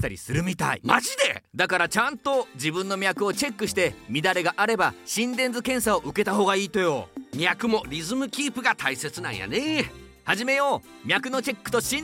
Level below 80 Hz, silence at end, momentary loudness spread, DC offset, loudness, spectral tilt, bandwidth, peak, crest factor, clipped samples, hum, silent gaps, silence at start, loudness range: -54 dBFS; 0 s; 6 LU; under 0.1%; -25 LUFS; -3.5 dB/octave; 16.5 kHz; -2 dBFS; 24 dB; under 0.1%; none; none; 0 s; 2 LU